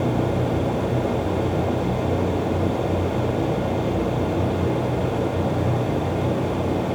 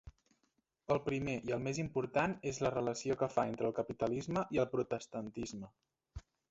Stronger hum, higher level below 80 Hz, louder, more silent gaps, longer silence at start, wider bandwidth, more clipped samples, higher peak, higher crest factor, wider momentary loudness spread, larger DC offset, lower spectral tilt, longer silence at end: neither; first, -40 dBFS vs -62 dBFS; first, -23 LUFS vs -37 LUFS; neither; about the same, 0 s vs 0.05 s; first, over 20 kHz vs 8 kHz; neither; first, -8 dBFS vs -18 dBFS; second, 14 dB vs 20 dB; second, 1 LU vs 17 LU; neither; first, -8 dB/octave vs -6 dB/octave; second, 0 s vs 0.3 s